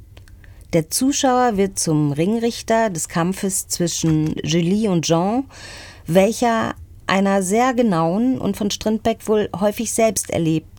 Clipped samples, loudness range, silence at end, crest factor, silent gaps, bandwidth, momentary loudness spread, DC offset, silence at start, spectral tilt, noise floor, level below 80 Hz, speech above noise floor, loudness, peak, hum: under 0.1%; 1 LU; 0 s; 16 dB; none; 19.5 kHz; 5 LU; under 0.1%; 0 s; -5 dB/octave; -42 dBFS; -46 dBFS; 23 dB; -19 LUFS; -2 dBFS; none